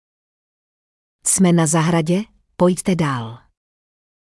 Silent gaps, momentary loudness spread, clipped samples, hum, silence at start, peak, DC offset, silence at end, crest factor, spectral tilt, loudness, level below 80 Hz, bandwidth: none; 12 LU; under 0.1%; none; 1.25 s; -4 dBFS; under 0.1%; 0.9 s; 16 dB; -5 dB/octave; -18 LUFS; -54 dBFS; 12 kHz